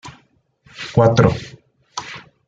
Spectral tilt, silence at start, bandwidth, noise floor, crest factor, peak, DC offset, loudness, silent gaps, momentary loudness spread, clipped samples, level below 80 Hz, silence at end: -6.5 dB/octave; 0.05 s; 7.8 kHz; -58 dBFS; 18 dB; -2 dBFS; under 0.1%; -16 LUFS; none; 20 LU; under 0.1%; -44 dBFS; 0.3 s